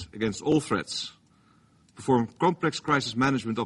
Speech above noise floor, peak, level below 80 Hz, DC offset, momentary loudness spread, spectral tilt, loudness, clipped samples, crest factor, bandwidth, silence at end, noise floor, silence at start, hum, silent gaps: 35 dB; -10 dBFS; -60 dBFS; under 0.1%; 9 LU; -5 dB/octave; -27 LUFS; under 0.1%; 18 dB; 11.5 kHz; 0 s; -61 dBFS; 0 s; none; none